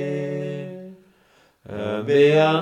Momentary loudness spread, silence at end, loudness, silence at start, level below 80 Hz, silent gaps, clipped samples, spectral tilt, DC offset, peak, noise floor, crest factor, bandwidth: 21 LU; 0 s; -20 LUFS; 0 s; -64 dBFS; none; under 0.1%; -7 dB/octave; under 0.1%; -6 dBFS; -58 dBFS; 16 dB; 9 kHz